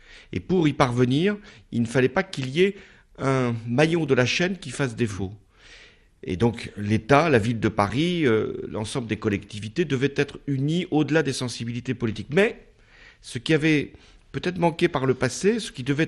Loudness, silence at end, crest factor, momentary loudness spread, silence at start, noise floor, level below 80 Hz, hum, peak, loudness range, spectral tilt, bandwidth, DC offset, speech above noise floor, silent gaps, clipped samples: -24 LUFS; 0 s; 22 dB; 11 LU; 0.1 s; -52 dBFS; -52 dBFS; none; -2 dBFS; 2 LU; -6 dB/octave; 12 kHz; under 0.1%; 28 dB; none; under 0.1%